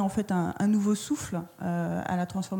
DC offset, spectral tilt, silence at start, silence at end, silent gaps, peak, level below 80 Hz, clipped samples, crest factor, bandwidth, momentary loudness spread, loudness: under 0.1%; -6 dB/octave; 0 s; 0 s; none; -16 dBFS; -60 dBFS; under 0.1%; 12 dB; 17.5 kHz; 7 LU; -29 LUFS